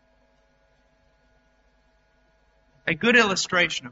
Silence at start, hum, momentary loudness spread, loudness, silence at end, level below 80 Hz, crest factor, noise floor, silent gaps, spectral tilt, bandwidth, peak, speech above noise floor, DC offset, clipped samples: 2.85 s; none; 10 LU; -21 LUFS; 0 s; -62 dBFS; 22 dB; -64 dBFS; none; -1.5 dB/octave; 8 kHz; -6 dBFS; 42 dB; under 0.1%; under 0.1%